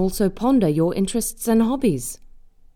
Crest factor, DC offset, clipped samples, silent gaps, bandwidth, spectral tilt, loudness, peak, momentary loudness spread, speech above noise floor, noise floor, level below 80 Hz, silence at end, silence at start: 14 dB; under 0.1%; under 0.1%; none; 18.5 kHz; -6 dB/octave; -20 LUFS; -6 dBFS; 9 LU; 26 dB; -45 dBFS; -40 dBFS; 0.5 s; 0 s